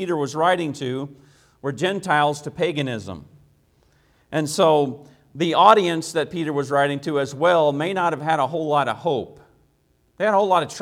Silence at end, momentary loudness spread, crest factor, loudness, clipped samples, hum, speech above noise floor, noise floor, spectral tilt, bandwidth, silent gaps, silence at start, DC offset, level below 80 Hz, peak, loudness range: 0 s; 12 LU; 22 dB; -21 LUFS; under 0.1%; none; 42 dB; -63 dBFS; -5 dB/octave; 16 kHz; none; 0 s; under 0.1%; -62 dBFS; 0 dBFS; 6 LU